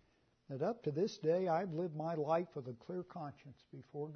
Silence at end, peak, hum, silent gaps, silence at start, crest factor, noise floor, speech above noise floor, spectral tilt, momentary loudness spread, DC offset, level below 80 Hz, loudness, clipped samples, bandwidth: 0 s; -22 dBFS; none; none; 0.5 s; 18 dB; -68 dBFS; 29 dB; -6.5 dB/octave; 15 LU; under 0.1%; -82 dBFS; -39 LUFS; under 0.1%; 6.4 kHz